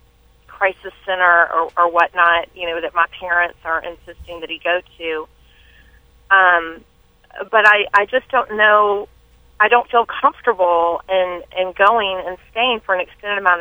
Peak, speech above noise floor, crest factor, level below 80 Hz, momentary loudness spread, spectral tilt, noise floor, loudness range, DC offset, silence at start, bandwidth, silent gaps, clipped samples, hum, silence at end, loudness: 0 dBFS; 34 dB; 18 dB; -52 dBFS; 13 LU; -4 dB/octave; -51 dBFS; 6 LU; under 0.1%; 0.5 s; over 20 kHz; none; under 0.1%; none; 0 s; -16 LUFS